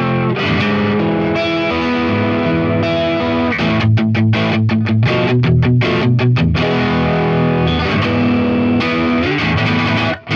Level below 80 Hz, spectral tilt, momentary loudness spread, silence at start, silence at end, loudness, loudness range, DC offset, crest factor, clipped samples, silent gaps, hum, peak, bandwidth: -36 dBFS; -7.5 dB/octave; 2 LU; 0 s; 0 s; -14 LUFS; 2 LU; under 0.1%; 12 dB; under 0.1%; none; none; -2 dBFS; 7 kHz